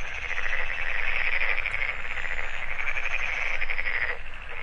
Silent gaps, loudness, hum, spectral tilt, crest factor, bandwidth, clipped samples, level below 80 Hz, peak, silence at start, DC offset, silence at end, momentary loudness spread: none; -28 LUFS; none; -2.5 dB/octave; 14 dB; 7 kHz; under 0.1%; -34 dBFS; -10 dBFS; 0 s; under 0.1%; 0 s; 6 LU